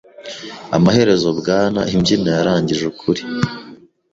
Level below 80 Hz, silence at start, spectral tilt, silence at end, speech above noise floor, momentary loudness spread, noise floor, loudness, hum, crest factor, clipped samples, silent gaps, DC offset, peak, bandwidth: -46 dBFS; 0.2 s; -6 dB/octave; 0.35 s; 25 dB; 17 LU; -41 dBFS; -16 LUFS; none; 16 dB; under 0.1%; none; under 0.1%; 0 dBFS; 7.8 kHz